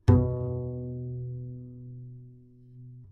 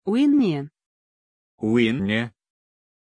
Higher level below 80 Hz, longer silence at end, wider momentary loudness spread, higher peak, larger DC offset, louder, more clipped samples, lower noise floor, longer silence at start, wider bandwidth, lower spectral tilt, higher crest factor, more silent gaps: first, -44 dBFS vs -62 dBFS; second, 0 s vs 0.9 s; first, 24 LU vs 13 LU; about the same, -6 dBFS vs -8 dBFS; neither; second, -31 LUFS vs -22 LUFS; neither; second, -52 dBFS vs under -90 dBFS; about the same, 0.05 s vs 0.05 s; second, 6.2 kHz vs 10 kHz; first, -10.5 dB/octave vs -7 dB/octave; first, 24 dB vs 16 dB; second, none vs 0.86-1.58 s